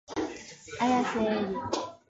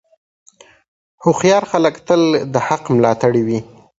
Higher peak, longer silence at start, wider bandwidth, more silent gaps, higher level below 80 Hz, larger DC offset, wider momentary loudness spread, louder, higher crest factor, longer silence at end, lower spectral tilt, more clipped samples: second, -14 dBFS vs 0 dBFS; second, 0.1 s vs 1.2 s; about the same, 8 kHz vs 8 kHz; neither; second, -60 dBFS vs -54 dBFS; neither; first, 12 LU vs 5 LU; second, -30 LUFS vs -15 LUFS; about the same, 16 dB vs 16 dB; second, 0.15 s vs 0.35 s; second, -4.5 dB/octave vs -6 dB/octave; neither